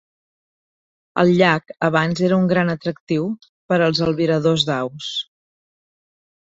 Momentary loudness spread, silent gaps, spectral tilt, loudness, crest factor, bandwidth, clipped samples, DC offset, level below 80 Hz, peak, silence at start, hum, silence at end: 11 LU; 3.00-3.07 s, 3.49-3.69 s; -6 dB/octave; -19 LUFS; 18 dB; 8 kHz; under 0.1%; under 0.1%; -56 dBFS; -2 dBFS; 1.15 s; none; 1.3 s